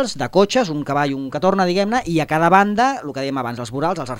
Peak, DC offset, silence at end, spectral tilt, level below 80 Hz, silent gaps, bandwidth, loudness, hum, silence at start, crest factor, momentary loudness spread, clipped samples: 0 dBFS; under 0.1%; 0 s; -5.5 dB/octave; -50 dBFS; none; 16 kHz; -18 LUFS; none; 0 s; 18 dB; 10 LU; under 0.1%